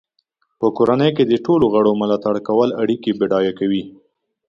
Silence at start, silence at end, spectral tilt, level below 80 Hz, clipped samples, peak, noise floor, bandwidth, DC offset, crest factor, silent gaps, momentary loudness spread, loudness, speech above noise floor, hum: 0.6 s; 0.6 s; -8 dB/octave; -56 dBFS; under 0.1%; -2 dBFS; -68 dBFS; 7.2 kHz; under 0.1%; 16 dB; none; 6 LU; -17 LUFS; 51 dB; none